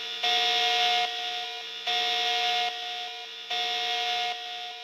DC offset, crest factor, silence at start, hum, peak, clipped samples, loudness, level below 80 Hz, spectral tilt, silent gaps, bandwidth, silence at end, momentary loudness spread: under 0.1%; 16 dB; 0 s; none; -12 dBFS; under 0.1%; -26 LUFS; under -90 dBFS; 1.5 dB/octave; none; 15.5 kHz; 0 s; 11 LU